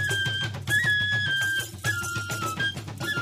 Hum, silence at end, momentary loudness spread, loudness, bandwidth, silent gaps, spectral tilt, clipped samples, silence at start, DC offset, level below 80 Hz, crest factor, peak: none; 0 s; 8 LU; -26 LUFS; 15.5 kHz; none; -2.5 dB/octave; under 0.1%; 0 s; under 0.1%; -56 dBFS; 14 dB; -14 dBFS